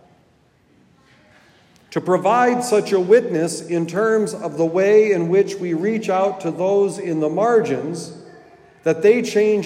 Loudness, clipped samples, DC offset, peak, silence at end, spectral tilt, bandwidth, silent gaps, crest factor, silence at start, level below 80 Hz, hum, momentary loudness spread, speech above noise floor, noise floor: -18 LUFS; under 0.1%; under 0.1%; -2 dBFS; 0 s; -5.5 dB/octave; 13.5 kHz; none; 16 dB; 1.9 s; -70 dBFS; none; 9 LU; 39 dB; -57 dBFS